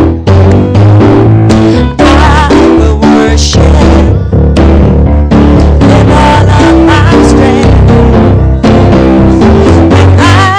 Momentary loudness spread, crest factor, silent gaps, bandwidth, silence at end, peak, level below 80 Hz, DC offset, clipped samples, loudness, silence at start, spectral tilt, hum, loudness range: 2 LU; 2 dB; none; 9.8 kHz; 0 s; 0 dBFS; -10 dBFS; under 0.1%; 20%; -4 LUFS; 0 s; -7 dB/octave; none; 1 LU